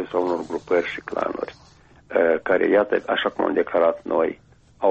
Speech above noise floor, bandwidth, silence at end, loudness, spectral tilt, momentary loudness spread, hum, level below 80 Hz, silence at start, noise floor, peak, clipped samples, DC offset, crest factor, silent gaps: 30 dB; 8 kHz; 0 s; -22 LUFS; -6 dB/octave; 9 LU; none; -58 dBFS; 0 s; -52 dBFS; -6 dBFS; under 0.1%; under 0.1%; 16 dB; none